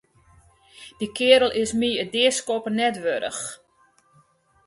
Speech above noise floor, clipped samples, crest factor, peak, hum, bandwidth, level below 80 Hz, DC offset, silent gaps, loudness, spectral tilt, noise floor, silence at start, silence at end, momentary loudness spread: 39 dB; under 0.1%; 20 dB; -4 dBFS; none; 11.5 kHz; -58 dBFS; under 0.1%; none; -22 LUFS; -2.5 dB/octave; -61 dBFS; 0.8 s; 1.1 s; 15 LU